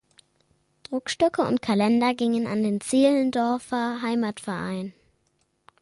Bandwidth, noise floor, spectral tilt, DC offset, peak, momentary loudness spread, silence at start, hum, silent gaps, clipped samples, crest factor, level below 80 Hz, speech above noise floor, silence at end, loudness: 11.5 kHz; -70 dBFS; -5 dB/octave; under 0.1%; -8 dBFS; 11 LU; 0.9 s; none; none; under 0.1%; 18 dB; -64 dBFS; 47 dB; 0.9 s; -24 LUFS